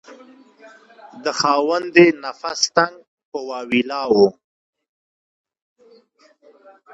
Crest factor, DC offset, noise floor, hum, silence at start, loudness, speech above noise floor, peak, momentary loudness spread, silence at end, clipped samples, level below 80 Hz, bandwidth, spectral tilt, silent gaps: 20 dB; under 0.1%; -55 dBFS; none; 0.1 s; -18 LUFS; 37 dB; 0 dBFS; 15 LU; 2.65 s; under 0.1%; -68 dBFS; 8 kHz; -3.5 dB/octave; 3.07-3.18 s, 3.25-3.32 s